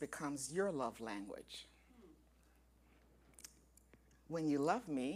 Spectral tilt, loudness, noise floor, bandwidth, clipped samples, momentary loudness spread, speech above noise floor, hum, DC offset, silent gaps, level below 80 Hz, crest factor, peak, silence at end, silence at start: -5 dB/octave; -41 LUFS; -70 dBFS; 15.5 kHz; under 0.1%; 21 LU; 29 dB; none; under 0.1%; none; -72 dBFS; 22 dB; -22 dBFS; 0 s; 0 s